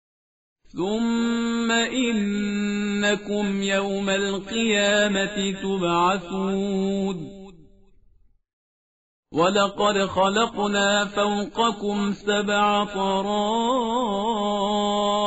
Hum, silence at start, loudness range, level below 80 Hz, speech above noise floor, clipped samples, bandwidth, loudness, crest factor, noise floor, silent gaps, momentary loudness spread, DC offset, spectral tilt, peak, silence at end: none; 0.75 s; 4 LU; -52 dBFS; 36 dB; under 0.1%; 8 kHz; -23 LUFS; 16 dB; -58 dBFS; 8.53-9.23 s; 5 LU; 0.2%; -3 dB/octave; -8 dBFS; 0 s